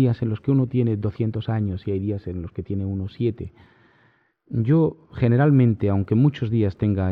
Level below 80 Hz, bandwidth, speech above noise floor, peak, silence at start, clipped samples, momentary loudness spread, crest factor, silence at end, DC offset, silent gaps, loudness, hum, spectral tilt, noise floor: -52 dBFS; 4.9 kHz; 40 dB; -8 dBFS; 0 s; under 0.1%; 11 LU; 14 dB; 0 s; under 0.1%; none; -22 LUFS; none; -11 dB/octave; -61 dBFS